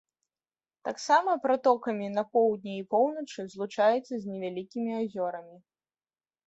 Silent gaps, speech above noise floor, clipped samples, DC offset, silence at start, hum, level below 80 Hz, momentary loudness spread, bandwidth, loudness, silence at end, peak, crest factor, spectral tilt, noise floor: none; over 62 dB; under 0.1%; under 0.1%; 0.85 s; none; -78 dBFS; 12 LU; 8.2 kHz; -29 LUFS; 0.9 s; -10 dBFS; 20 dB; -5 dB/octave; under -90 dBFS